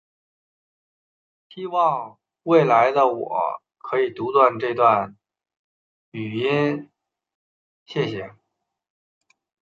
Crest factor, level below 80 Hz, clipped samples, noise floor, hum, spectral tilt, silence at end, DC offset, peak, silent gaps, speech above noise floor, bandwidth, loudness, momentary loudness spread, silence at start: 20 dB; -70 dBFS; under 0.1%; -79 dBFS; none; -7.5 dB/octave; 1.4 s; under 0.1%; -2 dBFS; 5.57-6.12 s, 7.35-7.86 s; 59 dB; 7 kHz; -21 LUFS; 18 LU; 1.55 s